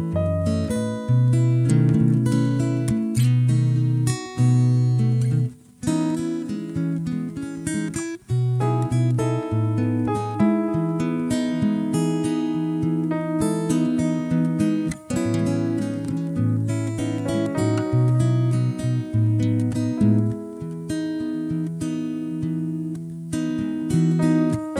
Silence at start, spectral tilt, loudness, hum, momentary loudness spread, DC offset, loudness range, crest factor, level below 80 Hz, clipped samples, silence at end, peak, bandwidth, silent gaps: 0 s; -7.5 dB/octave; -22 LUFS; none; 8 LU; under 0.1%; 5 LU; 14 dB; -50 dBFS; under 0.1%; 0 s; -6 dBFS; 12.5 kHz; none